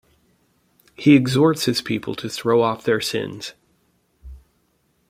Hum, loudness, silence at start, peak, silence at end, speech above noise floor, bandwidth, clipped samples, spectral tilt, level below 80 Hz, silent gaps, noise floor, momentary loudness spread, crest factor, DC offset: none; -19 LUFS; 1 s; -2 dBFS; 0.7 s; 47 dB; 16 kHz; under 0.1%; -5.5 dB/octave; -52 dBFS; none; -65 dBFS; 14 LU; 20 dB; under 0.1%